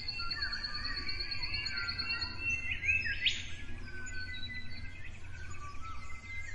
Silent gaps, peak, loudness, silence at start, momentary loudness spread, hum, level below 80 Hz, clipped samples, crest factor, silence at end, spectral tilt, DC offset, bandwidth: none; -18 dBFS; -35 LUFS; 0 s; 16 LU; none; -48 dBFS; under 0.1%; 20 dB; 0 s; -2 dB/octave; under 0.1%; 11 kHz